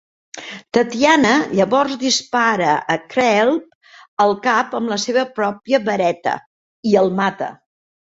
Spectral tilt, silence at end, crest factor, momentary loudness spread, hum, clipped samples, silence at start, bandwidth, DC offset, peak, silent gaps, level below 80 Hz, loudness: -4 dB/octave; 0.6 s; 16 dB; 13 LU; none; under 0.1%; 0.35 s; 8 kHz; under 0.1%; -2 dBFS; 3.75-3.81 s, 4.08-4.17 s, 6.46-6.83 s; -60 dBFS; -17 LUFS